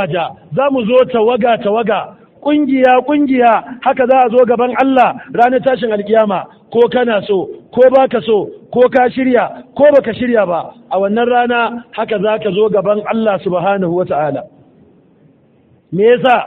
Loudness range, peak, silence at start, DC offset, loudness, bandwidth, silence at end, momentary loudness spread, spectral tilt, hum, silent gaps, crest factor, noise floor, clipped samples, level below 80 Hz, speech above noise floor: 4 LU; 0 dBFS; 0 s; under 0.1%; -13 LUFS; 4.4 kHz; 0 s; 9 LU; -8.5 dB/octave; none; none; 12 dB; -50 dBFS; under 0.1%; -54 dBFS; 38 dB